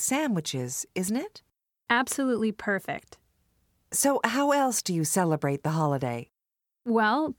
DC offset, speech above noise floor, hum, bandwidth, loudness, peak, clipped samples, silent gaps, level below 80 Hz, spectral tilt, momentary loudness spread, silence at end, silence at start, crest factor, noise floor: under 0.1%; 60 dB; none; 19.5 kHz; -27 LUFS; -8 dBFS; under 0.1%; none; -68 dBFS; -4 dB/octave; 9 LU; 0.05 s; 0 s; 20 dB; -87 dBFS